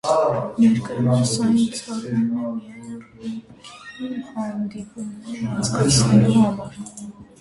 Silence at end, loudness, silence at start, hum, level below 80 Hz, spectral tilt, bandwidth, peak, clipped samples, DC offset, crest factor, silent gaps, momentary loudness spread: 0.15 s; -20 LUFS; 0.05 s; none; -50 dBFS; -5.5 dB/octave; 11.5 kHz; -4 dBFS; under 0.1%; under 0.1%; 18 dB; none; 20 LU